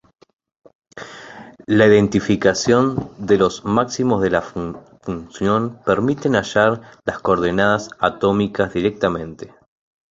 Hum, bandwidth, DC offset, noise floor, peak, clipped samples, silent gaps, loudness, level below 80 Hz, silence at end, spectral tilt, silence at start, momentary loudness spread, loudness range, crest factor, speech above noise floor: none; 7.8 kHz; under 0.1%; -39 dBFS; -2 dBFS; under 0.1%; none; -18 LUFS; -46 dBFS; 0.65 s; -5.5 dB/octave; 0.95 s; 19 LU; 3 LU; 18 dB; 21 dB